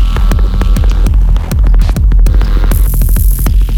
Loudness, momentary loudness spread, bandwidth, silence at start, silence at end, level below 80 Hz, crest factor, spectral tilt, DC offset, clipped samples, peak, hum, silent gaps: -12 LUFS; 2 LU; 17.5 kHz; 0 s; 0 s; -8 dBFS; 6 dB; -6 dB/octave; under 0.1%; under 0.1%; 0 dBFS; none; none